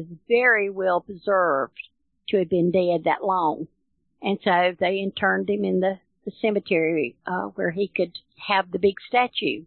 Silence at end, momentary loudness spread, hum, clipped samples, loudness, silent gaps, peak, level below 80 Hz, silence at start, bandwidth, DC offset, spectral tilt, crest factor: 0 s; 11 LU; none; under 0.1%; -23 LUFS; none; -6 dBFS; -64 dBFS; 0 s; 4.4 kHz; under 0.1%; -10 dB/octave; 18 dB